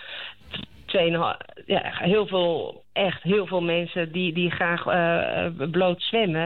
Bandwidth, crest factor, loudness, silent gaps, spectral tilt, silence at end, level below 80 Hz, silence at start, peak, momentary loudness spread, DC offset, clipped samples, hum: 4.4 kHz; 12 dB; -24 LUFS; none; -8.5 dB/octave; 0 s; -58 dBFS; 0 s; -12 dBFS; 13 LU; 0.3%; under 0.1%; none